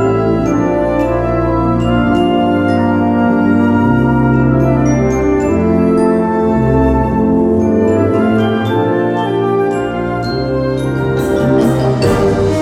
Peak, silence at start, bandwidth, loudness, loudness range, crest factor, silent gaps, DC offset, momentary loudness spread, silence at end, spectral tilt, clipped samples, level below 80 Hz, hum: 0 dBFS; 0 s; 13.5 kHz; -13 LUFS; 3 LU; 12 dB; none; under 0.1%; 4 LU; 0 s; -8 dB/octave; under 0.1%; -28 dBFS; none